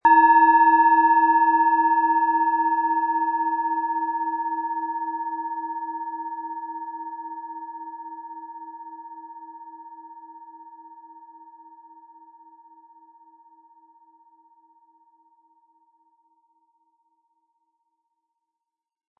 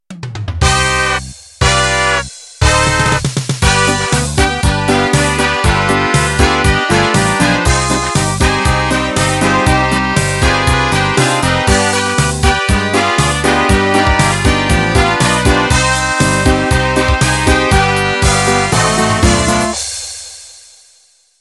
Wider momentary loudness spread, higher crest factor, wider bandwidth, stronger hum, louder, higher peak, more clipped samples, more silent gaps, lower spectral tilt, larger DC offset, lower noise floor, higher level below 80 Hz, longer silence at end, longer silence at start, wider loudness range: first, 26 LU vs 4 LU; first, 18 dB vs 12 dB; second, 4 kHz vs 12.5 kHz; neither; second, -21 LUFS vs -12 LUFS; second, -6 dBFS vs 0 dBFS; neither; neither; first, -7 dB/octave vs -4 dB/octave; neither; first, -87 dBFS vs -50 dBFS; second, -80 dBFS vs -22 dBFS; first, 7.9 s vs 0.8 s; about the same, 0.05 s vs 0.1 s; first, 26 LU vs 1 LU